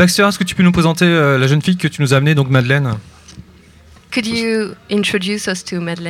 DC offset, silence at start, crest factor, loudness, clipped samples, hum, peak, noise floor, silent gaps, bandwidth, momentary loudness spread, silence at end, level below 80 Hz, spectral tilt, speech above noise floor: under 0.1%; 0 s; 14 dB; -15 LUFS; under 0.1%; none; 0 dBFS; -44 dBFS; none; 15.5 kHz; 8 LU; 0 s; -46 dBFS; -5.5 dB/octave; 30 dB